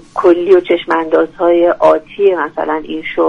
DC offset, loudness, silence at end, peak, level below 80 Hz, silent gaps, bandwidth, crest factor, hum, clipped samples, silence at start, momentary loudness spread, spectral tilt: under 0.1%; -12 LUFS; 0 s; 0 dBFS; -48 dBFS; none; 6.8 kHz; 12 dB; none; under 0.1%; 0.15 s; 8 LU; -6 dB/octave